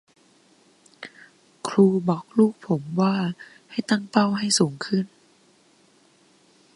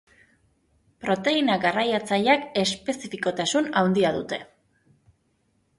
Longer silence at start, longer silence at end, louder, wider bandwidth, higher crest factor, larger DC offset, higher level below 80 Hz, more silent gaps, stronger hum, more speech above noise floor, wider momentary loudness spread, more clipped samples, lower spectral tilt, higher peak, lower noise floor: about the same, 1 s vs 1 s; first, 1.7 s vs 1.35 s; about the same, -23 LUFS vs -24 LUFS; about the same, 11.5 kHz vs 11.5 kHz; about the same, 24 dB vs 20 dB; neither; second, -70 dBFS vs -62 dBFS; neither; neither; second, 37 dB vs 45 dB; first, 21 LU vs 10 LU; neither; about the same, -5 dB/octave vs -4 dB/octave; first, -2 dBFS vs -6 dBFS; second, -59 dBFS vs -69 dBFS